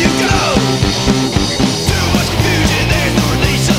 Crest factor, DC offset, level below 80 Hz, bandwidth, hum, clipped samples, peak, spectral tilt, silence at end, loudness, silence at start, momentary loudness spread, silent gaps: 12 dB; under 0.1%; -24 dBFS; 19.5 kHz; none; under 0.1%; 0 dBFS; -4.5 dB/octave; 0 s; -13 LUFS; 0 s; 2 LU; none